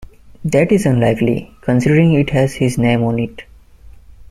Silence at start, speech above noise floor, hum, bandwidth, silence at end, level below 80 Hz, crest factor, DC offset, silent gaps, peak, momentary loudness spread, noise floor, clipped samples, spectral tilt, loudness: 0 s; 26 dB; none; 13.5 kHz; 0.05 s; -40 dBFS; 14 dB; under 0.1%; none; -2 dBFS; 9 LU; -40 dBFS; under 0.1%; -7 dB/octave; -15 LUFS